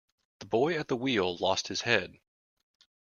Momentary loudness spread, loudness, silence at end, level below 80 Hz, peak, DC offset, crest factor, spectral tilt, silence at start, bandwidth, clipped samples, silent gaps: 4 LU; -29 LUFS; 0.95 s; -68 dBFS; -8 dBFS; under 0.1%; 24 dB; -4 dB/octave; 0.4 s; 7.4 kHz; under 0.1%; none